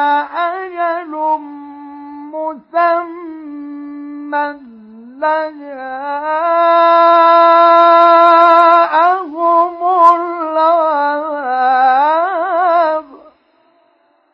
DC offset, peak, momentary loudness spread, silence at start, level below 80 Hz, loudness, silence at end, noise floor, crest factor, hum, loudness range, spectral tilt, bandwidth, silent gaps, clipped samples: under 0.1%; 0 dBFS; 21 LU; 0 s; -66 dBFS; -11 LUFS; 1.15 s; -56 dBFS; 12 dB; none; 12 LU; -4 dB/octave; 5.8 kHz; none; under 0.1%